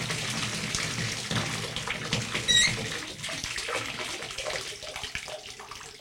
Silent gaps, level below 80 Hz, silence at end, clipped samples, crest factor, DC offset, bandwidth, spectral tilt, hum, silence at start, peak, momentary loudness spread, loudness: none; -52 dBFS; 0 s; under 0.1%; 22 dB; under 0.1%; 17 kHz; -2 dB/octave; none; 0 s; -10 dBFS; 14 LU; -29 LUFS